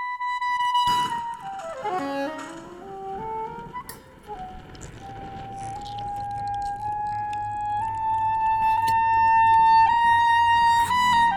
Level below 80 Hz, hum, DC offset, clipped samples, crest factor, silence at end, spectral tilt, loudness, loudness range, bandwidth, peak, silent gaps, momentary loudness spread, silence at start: -50 dBFS; none; under 0.1%; under 0.1%; 14 dB; 0 s; -3.5 dB/octave; -22 LUFS; 16 LU; 18.5 kHz; -10 dBFS; none; 21 LU; 0 s